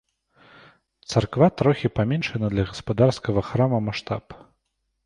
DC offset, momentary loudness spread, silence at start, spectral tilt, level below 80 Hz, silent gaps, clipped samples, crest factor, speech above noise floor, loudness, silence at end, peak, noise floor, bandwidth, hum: under 0.1%; 10 LU; 1.1 s; -7 dB/octave; -46 dBFS; none; under 0.1%; 20 dB; 53 dB; -23 LUFS; 0.7 s; -4 dBFS; -75 dBFS; 10.5 kHz; none